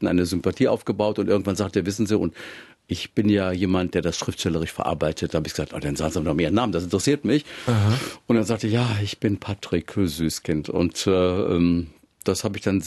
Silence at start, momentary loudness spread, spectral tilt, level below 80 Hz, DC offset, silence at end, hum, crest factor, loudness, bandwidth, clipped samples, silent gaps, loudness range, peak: 0 s; 6 LU; -6 dB/octave; -46 dBFS; under 0.1%; 0 s; none; 16 dB; -23 LUFS; 13 kHz; under 0.1%; none; 2 LU; -6 dBFS